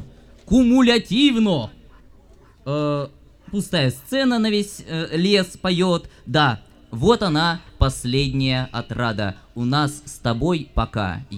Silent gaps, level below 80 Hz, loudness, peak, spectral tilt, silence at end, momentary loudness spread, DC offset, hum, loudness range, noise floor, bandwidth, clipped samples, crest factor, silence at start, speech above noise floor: none; -38 dBFS; -20 LUFS; -2 dBFS; -5.5 dB/octave; 0 s; 11 LU; under 0.1%; none; 4 LU; -49 dBFS; 15.5 kHz; under 0.1%; 20 dB; 0 s; 29 dB